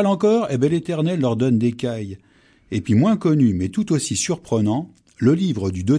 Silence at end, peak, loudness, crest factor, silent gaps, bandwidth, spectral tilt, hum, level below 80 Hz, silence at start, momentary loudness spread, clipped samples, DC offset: 0 s; -6 dBFS; -20 LUFS; 14 dB; none; 10.5 kHz; -6.5 dB/octave; none; -54 dBFS; 0 s; 9 LU; under 0.1%; under 0.1%